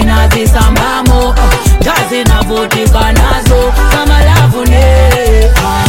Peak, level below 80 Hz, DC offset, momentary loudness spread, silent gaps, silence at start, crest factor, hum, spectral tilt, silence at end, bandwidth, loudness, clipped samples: 0 dBFS; -8 dBFS; under 0.1%; 3 LU; none; 0 s; 6 dB; none; -5 dB/octave; 0 s; 17 kHz; -8 LUFS; 0.6%